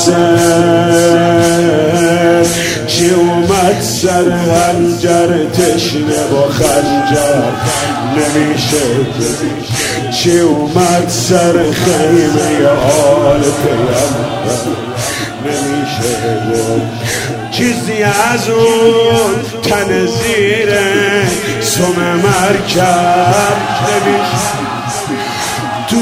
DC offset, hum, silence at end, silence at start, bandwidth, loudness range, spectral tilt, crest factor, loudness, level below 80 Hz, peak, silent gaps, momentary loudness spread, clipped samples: under 0.1%; none; 0 s; 0 s; 16.5 kHz; 4 LU; -4.5 dB/octave; 10 dB; -11 LUFS; -40 dBFS; 0 dBFS; none; 7 LU; 0.3%